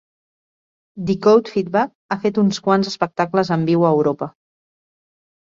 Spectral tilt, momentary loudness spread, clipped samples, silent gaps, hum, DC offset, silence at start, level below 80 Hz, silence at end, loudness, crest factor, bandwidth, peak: -6.5 dB/octave; 9 LU; under 0.1%; 1.95-2.09 s; none; under 0.1%; 0.95 s; -60 dBFS; 1.15 s; -18 LUFS; 16 dB; 7.6 kHz; -2 dBFS